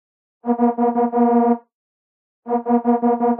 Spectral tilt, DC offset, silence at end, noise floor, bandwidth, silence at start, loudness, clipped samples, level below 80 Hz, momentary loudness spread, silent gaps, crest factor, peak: -12 dB/octave; under 0.1%; 0 s; under -90 dBFS; 2.8 kHz; 0.45 s; -18 LUFS; under 0.1%; -82 dBFS; 8 LU; 1.74-2.43 s; 16 dB; -4 dBFS